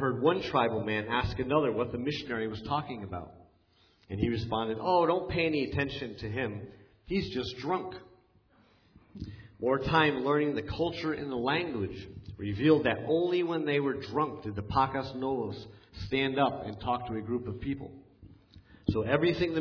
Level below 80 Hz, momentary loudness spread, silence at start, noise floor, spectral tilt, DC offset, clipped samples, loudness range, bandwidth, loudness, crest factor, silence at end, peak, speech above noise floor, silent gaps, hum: -52 dBFS; 15 LU; 0 s; -66 dBFS; -7.5 dB/octave; under 0.1%; under 0.1%; 5 LU; 5.4 kHz; -31 LUFS; 20 dB; 0 s; -10 dBFS; 35 dB; none; none